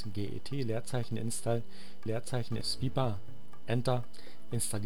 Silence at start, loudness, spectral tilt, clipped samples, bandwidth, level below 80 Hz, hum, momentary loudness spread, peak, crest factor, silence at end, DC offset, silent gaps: 0 s; -36 LUFS; -5 dB/octave; under 0.1%; 18.5 kHz; -58 dBFS; none; 15 LU; -16 dBFS; 18 dB; 0 s; 2%; none